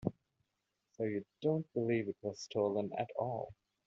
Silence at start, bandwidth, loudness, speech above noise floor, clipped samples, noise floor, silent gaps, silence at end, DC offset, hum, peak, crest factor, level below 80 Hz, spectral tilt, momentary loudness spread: 0 s; 7.4 kHz; -38 LUFS; 49 dB; under 0.1%; -86 dBFS; none; 0.35 s; under 0.1%; none; -20 dBFS; 20 dB; -72 dBFS; -6.5 dB/octave; 8 LU